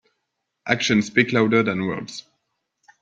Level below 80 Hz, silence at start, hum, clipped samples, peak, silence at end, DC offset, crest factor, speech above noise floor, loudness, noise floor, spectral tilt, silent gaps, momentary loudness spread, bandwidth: -62 dBFS; 0.65 s; none; under 0.1%; -2 dBFS; 0.8 s; under 0.1%; 22 dB; 57 dB; -20 LUFS; -78 dBFS; -5 dB/octave; none; 18 LU; 7.8 kHz